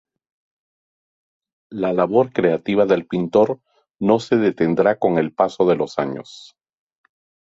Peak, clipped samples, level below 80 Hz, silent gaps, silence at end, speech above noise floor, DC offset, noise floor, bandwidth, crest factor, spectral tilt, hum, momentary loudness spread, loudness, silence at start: -2 dBFS; under 0.1%; -60 dBFS; none; 1.1 s; over 72 dB; under 0.1%; under -90 dBFS; 7.8 kHz; 18 dB; -7.5 dB/octave; none; 8 LU; -19 LUFS; 1.7 s